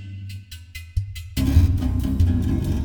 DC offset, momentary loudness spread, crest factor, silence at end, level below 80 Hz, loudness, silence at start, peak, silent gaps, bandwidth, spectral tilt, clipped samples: under 0.1%; 18 LU; 18 dB; 0 s; -26 dBFS; -22 LUFS; 0 s; -4 dBFS; none; 19.5 kHz; -7.5 dB/octave; under 0.1%